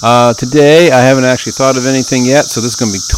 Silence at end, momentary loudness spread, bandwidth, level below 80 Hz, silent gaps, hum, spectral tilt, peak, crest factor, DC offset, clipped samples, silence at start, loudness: 0 s; 8 LU; 16.5 kHz; -34 dBFS; none; none; -4.5 dB/octave; 0 dBFS; 8 dB; under 0.1%; 1%; 0 s; -9 LUFS